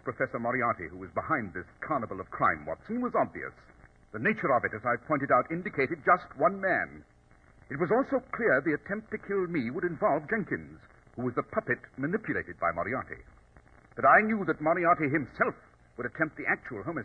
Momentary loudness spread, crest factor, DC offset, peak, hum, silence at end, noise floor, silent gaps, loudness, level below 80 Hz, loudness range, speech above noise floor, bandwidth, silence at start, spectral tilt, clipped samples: 12 LU; 22 dB; under 0.1%; -8 dBFS; none; 0 s; -59 dBFS; none; -29 LUFS; -60 dBFS; 5 LU; 30 dB; 5.8 kHz; 0.05 s; -9 dB/octave; under 0.1%